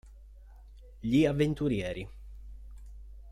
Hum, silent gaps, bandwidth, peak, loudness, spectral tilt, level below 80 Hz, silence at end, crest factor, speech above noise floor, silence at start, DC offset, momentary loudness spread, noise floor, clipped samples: none; none; 13.5 kHz; -14 dBFS; -30 LUFS; -7.5 dB/octave; -48 dBFS; 0 s; 20 dB; 23 dB; 0.05 s; under 0.1%; 24 LU; -51 dBFS; under 0.1%